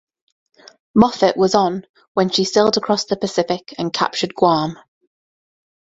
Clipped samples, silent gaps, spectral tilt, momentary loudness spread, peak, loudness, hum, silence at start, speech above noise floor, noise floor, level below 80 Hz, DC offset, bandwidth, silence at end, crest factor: under 0.1%; 1.89-1.94 s, 2.07-2.15 s; -4.5 dB/octave; 8 LU; 0 dBFS; -18 LUFS; none; 0.95 s; over 73 dB; under -90 dBFS; -54 dBFS; under 0.1%; 8 kHz; 1.2 s; 18 dB